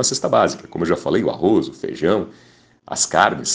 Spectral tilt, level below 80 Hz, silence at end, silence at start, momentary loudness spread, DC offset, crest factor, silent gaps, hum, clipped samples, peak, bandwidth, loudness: -3.5 dB/octave; -56 dBFS; 0 s; 0 s; 9 LU; under 0.1%; 20 dB; none; none; under 0.1%; 0 dBFS; 10 kHz; -19 LUFS